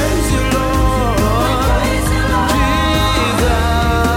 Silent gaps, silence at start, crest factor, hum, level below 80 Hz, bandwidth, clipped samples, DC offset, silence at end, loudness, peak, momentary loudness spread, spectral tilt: none; 0 s; 12 dB; none; -18 dBFS; 17 kHz; under 0.1%; under 0.1%; 0 s; -14 LUFS; -2 dBFS; 1 LU; -5 dB/octave